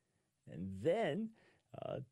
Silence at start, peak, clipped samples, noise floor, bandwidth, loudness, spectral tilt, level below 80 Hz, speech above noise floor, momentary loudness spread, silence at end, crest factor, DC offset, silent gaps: 0.45 s; -24 dBFS; under 0.1%; -66 dBFS; 11.5 kHz; -41 LUFS; -7 dB/octave; -76 dBFS; 26 dB; 17 LU; 0.05 s; 18 dB; under 0.1%; none